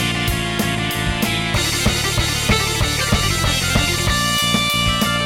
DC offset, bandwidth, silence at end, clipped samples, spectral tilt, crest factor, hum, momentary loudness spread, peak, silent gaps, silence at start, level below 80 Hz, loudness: under 0.1%; 17 kHz; 0 s; under 0.1%; -3 dB/octave; 14 dB; none; 4 LU; -4 dBFS; none; 0 s; -28 dBFS; -17 LUFS